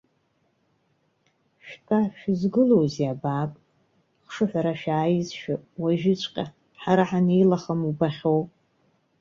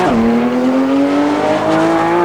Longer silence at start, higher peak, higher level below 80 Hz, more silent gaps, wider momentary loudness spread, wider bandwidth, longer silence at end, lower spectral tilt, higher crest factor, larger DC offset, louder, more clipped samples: first, 1.65 s vs 0 s; second, -6 dBFS vs -2 dBFS; second, -64 dBFS vs -42 dBFS; neither; first, 14 LU vs 1 LU; second, 7.4 kHz vs 11.5 kHz; first, 0.75 s vs 0 s; first, -7.5 dB/octave vs -6 dB/octave; first, 18 dB vs 10 dB; second, under 0.1% vs 0.4%; second, -24 LUFS vs -13 LUFS; neither